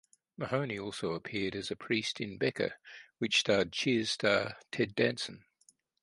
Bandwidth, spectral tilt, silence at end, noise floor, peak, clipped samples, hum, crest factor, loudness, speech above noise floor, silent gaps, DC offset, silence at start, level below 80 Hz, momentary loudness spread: 11.5 kHz; -4 dB/octave; 0.65 s; -69 dBFS; -12 dBFS; under 0.1%; none; 22 dB; -33 LUFS; 36 dB; none; under 0.1%; 0.4 s; -68 dBFS; 10 LU